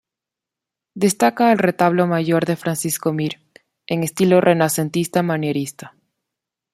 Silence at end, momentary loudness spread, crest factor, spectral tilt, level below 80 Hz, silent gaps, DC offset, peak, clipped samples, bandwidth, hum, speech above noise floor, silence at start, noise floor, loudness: 0.85 s; 10 LU; 18 dB; -5.5 dB/octave; -62 dBFS; none; under 0.1%; -2 dBFS; under 0.1%; 16 kHz; none; 68 dB; 0.95 s; -86 dBFS; -18 LUFS